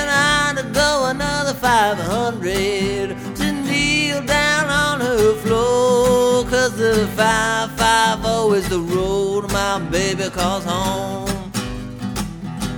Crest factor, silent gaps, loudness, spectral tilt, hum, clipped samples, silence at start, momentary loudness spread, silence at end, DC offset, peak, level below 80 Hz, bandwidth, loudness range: 16 dB; none; -18 LUFS; -4 dB/octave; none; under 0.1%; 0 s; 10 LU; 0 s; under 0.1%; -2 dBFS; -36 dBFS; over 20 kHz; 4 LU